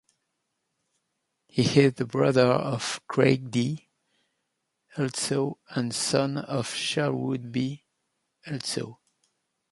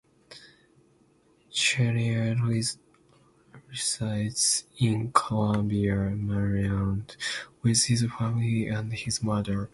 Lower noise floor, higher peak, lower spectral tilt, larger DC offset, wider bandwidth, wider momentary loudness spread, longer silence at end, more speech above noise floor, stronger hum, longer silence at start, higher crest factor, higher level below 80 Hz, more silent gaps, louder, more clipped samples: first, -80 dBFS vs -63 dBFS; about the same, -6 dBFS vs -4 dBFS; about the same, -5 dB/octave vs -4.5 dB/octave; neither; about the same, 11.5 kHz vs 11.5 kHz; first, 12 LU vs 8 LU; first, 0.75 s vs 0.05 s; first, 54 dB vs 36 dB; neither; first, 1.55 s vs 0.3 s; about the same, 22 dB vs 24 dB; second, -66 dBFS vs -50 dBFS; neither; about the same, -26 LUFS vs -27 LUFS; neither